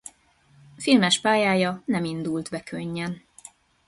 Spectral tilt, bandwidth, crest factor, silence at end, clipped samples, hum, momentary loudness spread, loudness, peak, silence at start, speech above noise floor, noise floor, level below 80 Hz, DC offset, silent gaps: -4.5 dB/octave; 11.5 kHz; 20 dB; 0.7 s; under 0.1%; none; 14 LU; -24 LUFS; -6 dBFS; 0.8 s; 36 dB; -59 dBFS; -64 dBFS; under 0.1%; none